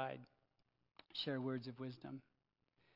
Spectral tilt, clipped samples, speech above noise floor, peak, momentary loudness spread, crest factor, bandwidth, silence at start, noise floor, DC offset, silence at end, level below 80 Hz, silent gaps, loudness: -4 dB/octave; under 0.1%; 38 dB; -28 dBFS; 18 LU; 20 dB; 5.8 kHz; 0 s; -84 dBFS; under 0.1%; 0.75 s; under -90 dBFS; none; -47 LUFS